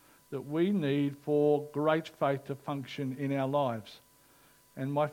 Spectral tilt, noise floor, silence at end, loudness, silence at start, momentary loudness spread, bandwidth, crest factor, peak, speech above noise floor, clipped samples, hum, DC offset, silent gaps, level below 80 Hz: -7.5 dB/octave; -62 dBFS; 0 s; -32 LUFS; 0.3 s; 13 LU; 17 kHz; 18 dB; -14 dBFS; 31 dB; under 0.1%; none; under 0.1%; none; -76 dBFS